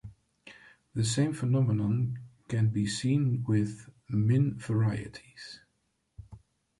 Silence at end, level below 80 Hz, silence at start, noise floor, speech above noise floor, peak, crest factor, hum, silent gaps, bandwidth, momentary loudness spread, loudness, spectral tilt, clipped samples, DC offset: 0.4 s; -60 dBFS; 0.05 s; -76 dBFS; 48 dB; -14 dBFS; 16 dB; none; none; 11.5 kHz; 19 LU; -29 LUFS; -6.5 dB/octave; under 0.1%; under 0.1%